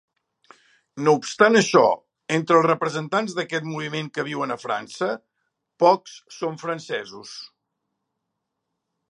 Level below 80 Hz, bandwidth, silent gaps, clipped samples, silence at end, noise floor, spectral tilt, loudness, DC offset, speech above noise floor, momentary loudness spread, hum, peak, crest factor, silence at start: -76 dBFS; 11 kHz; none; under 0.1%; 1.65 s; -80 dBFS; -4.5 dB/octave; -22 LUFS; under 0.1%; 58 dB; 16 LU; none; 0 dBFS; 24 dB; 0.95 s